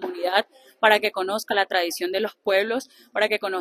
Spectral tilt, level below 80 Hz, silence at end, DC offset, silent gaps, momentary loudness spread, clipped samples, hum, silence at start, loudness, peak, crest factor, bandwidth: -2 dB/octave; -72 dBFS; 0 s; under 0.1%; none; 8 LU; under 0.1%; none; 0 s; -23 LUFS; -2 dBFS; 22 dB; 14.5 kHz